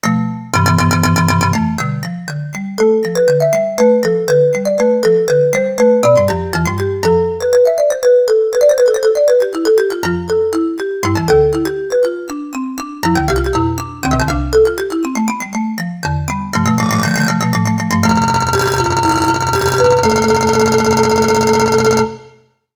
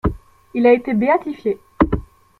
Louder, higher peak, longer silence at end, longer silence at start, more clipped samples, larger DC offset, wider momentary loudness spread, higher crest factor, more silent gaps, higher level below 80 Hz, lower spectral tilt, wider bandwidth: first, -14 LUFS vs -18 LUFS; about the same, 0 dBFS vs -2 dBFS; about the same, 0.45 s vs 0.4 s; about the same, 0.05 s vs 0.05 s; neither; neither; second, 8 LU vs 11 LU; about the same, 14 dB vs 16 dB; neither; about the same, -34 dBFS vs -34 dBFS; second, -5.5 dB/octave vs -9.5 dB/octave; first, over 20 kHz vs 4.9 kHz